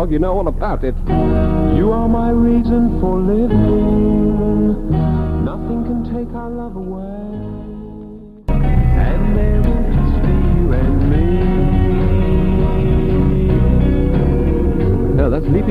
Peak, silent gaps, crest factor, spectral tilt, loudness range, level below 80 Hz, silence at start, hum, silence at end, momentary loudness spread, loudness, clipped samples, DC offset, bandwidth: 0 dBFS; none; 14 dB; -10.5 dB/octave; 7 LU; -18 dBFS; 0 s; none; 0 s; 12 LU; -16 LUFS; under 0.1%; under 0.1%; 4.5 kHz